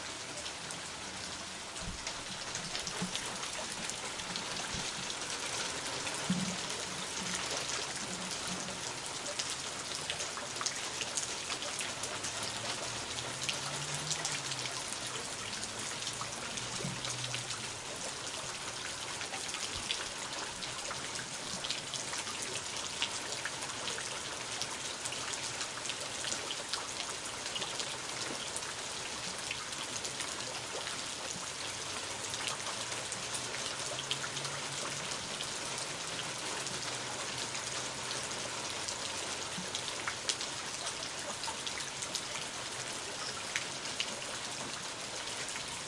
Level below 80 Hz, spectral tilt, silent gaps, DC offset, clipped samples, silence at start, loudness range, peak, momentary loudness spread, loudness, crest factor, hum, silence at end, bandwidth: -64 dBFS; -1 dB/octave; none; under 0.1%; under 0.1%; 0 s; 2 LU; -12 dBFS; 3 LU; -37 LUFS; 28 dB; none; 0 s; 12 kHz